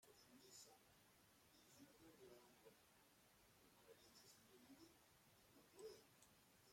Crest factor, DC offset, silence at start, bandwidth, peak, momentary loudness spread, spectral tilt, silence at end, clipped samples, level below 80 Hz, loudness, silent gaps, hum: 20 dB; under 0.1%; 0 s; 16.5 kHz; -48 dBFS; 6 LU; -3 dB/octave; 0 s; under 0.1%; under -90 dBFS; -67 LUFS; none; none